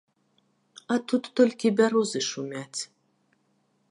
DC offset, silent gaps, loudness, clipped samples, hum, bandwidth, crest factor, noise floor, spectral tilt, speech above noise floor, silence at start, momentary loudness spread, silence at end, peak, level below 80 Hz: under 0.1%; none; -26 LUFS; under 0.1%; none; 11.5 kHz; 20 dB; -70 dBFS; -4 dB/octave; 45 dB; 0.9 s; 13 LU; 1.05 s; -8 dBFS; -82 dBFS